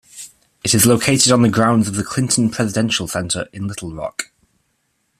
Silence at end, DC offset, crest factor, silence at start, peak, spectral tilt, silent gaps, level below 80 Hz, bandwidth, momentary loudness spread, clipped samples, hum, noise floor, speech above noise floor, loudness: 0.95 s; under 0.1%; 18 dB; 0.15 s; 0 dBFS; -4 dB/octave; none; -50 dBFS; 15 kHz; 16 LU; under 0.1%; none; -67 dBFS; 50 dB; -16 LUFS